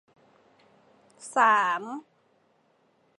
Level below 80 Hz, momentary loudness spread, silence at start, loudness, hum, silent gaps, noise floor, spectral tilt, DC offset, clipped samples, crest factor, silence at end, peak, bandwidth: -90 dBFS; 21 LU; 1.2 s; -24 LUFS; none; none; -67 dBFS; -2.5 dB/octave; under 0.1%; under 0.1%; 22 dB; 1.2 s; -8 dBFS; 11.5 kHz